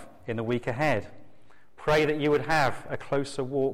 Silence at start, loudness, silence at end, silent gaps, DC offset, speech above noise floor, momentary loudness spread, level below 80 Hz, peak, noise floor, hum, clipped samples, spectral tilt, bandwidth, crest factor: 0 s; -27 LUFS; 0 s; none; under 0.1%; 32 dB; 10 LU; -50 dBFS; -14 dBFS; -58 dBFS; none; under 0.1%; -6 dB/octave; 16 kHz; 14 dB